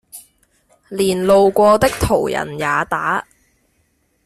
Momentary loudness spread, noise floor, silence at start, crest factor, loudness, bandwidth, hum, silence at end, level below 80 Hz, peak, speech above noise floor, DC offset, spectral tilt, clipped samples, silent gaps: 9 LU; -63 dBFS; 0.15 s; 16 dB; -16 LUFS; 14.5 kHz; none; 1.05 s; -40 dBFS; -2 dBFS; 48 dB; under 0.1%; -5 dB/octave; under 0.1%; none